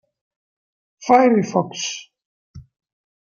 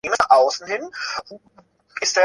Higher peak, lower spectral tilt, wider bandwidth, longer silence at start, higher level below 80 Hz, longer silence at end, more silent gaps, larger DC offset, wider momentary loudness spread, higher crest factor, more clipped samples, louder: about the same, -2 dBFS vs -2 dBFS; first, -4.5 dB/octave vs -0.5 dB/octave; second, 7.2 kHz vs 11.5 kHz; first, 1 s vs 0.05 s; about the same, -60 dBFS vs -62 dBFS; first, 0.6 s vs 0 s; first, 2.25-2.54 s vs none; neither; first, 17 LU vs 14 LU; about the same, 20 dB vs 18 dB; neither; about the same, -18 LUFS vs -20 LUFS